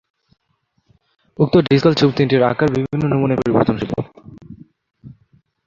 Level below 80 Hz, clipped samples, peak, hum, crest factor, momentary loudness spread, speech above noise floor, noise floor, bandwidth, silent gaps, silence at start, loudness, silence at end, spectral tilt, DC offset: -48 dBFS; under 0.1%; 0 dBFS; none; 18 dB; 10 LU; 50 dB; -66 dBFS; 7.4 kHz; none; 1.4 s; -16 LUFS; 0.55 s; -8 dB/octave; under 0.1%